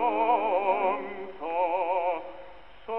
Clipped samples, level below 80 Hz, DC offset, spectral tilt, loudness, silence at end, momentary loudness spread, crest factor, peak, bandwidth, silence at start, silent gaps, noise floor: under 0.1%; -64 dBFS; 0.5%; -7.5 dB/octave; -27 LUFS; 0 s; 17 LU; 16 dB; -12 dBFS; 5.4 kHz; 0 s; none; -49 dBFS